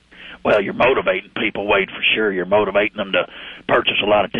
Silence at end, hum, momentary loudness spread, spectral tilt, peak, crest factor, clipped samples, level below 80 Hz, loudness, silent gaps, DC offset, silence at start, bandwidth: 0 s; none; 7 LU; -6.5 dB/octave; -4 dBFS; 14 dB; under 0.1%; -50 dBFS; -18 LUFS; none; under 0.1%; 0.2 s; 6 kHz